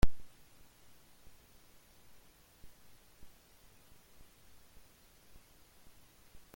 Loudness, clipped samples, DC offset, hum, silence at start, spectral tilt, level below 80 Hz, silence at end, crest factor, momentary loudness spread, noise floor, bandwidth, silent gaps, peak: -57 LUFS; under 0.1%; under 0.1%; none; 0.05 s; -5.5 dB/octave; -48 dBFS; 6.3 s; 24 dB; 1 LU; -62 dBFS; 17 kHz; none; -14 dBFS